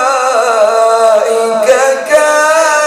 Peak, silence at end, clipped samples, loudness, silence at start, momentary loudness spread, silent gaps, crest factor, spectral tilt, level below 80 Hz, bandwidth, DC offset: 0 dBFS; 0 s; 0.2%; -9 LUFS; 0 s; 2 LU; none; 8 dB; -0.5 dB/octave; -58 dBFS; 16 kHz; under 0.1%